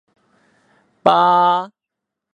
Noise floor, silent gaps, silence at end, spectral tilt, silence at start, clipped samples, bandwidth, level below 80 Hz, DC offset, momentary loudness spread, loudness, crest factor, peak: -82 dBFS; none; 0.65 s; -6 dB/octave; 1.05 s; under 0.1%; 10 kHz; -64 dBFS; under 0.1%; 10 LU; -15 LUFS; 18 dB; 0 dBFS